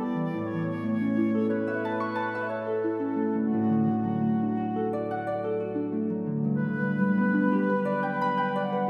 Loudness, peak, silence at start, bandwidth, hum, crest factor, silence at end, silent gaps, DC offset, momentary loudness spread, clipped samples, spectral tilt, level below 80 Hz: -27 LUFS; -12 dBFS; 0 s; 5.2 kHz; none; 14 dB; 0 s; none; under 0.1%; 6 LU; under 0.1%; -9.5 dB/octave; -68 dBFS